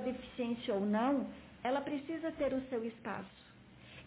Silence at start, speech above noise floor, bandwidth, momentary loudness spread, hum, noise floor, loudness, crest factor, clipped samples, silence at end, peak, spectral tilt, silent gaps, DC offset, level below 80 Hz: 0 s; 20 dB; 4 kHz; 13 LU; none; -56 dBFS; -38 LUFS; 14 dB; under 0.1%; 0 s; -24 dBFS; -5 dB/octave; none; under 0.1%; -66 dBFS